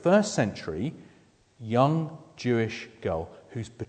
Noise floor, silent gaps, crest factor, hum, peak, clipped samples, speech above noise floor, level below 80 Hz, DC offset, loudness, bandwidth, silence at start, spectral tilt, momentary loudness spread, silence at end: -60 dBFS; none; 22 dB; none; -6 dBFS; under 0.1%; 33 dB; -58 dBFS; under 0.1%; -28 LUFS; 9.4 kHz; 0 s; -6 dB/octave; 16 LU; 0 s